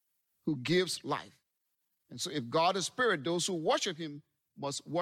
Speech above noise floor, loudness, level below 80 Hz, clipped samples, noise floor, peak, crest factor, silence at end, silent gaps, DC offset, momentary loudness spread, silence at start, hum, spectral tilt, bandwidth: 50 dB; -33 LUFS; -78 dBFS; under 0.1%; -83 dBFS; -18 dBFS; 16 dB; 0 s; none; under 0.1%; 12 LU; 0.45 s; none; -3.5 dB/octave; 15.5 kHz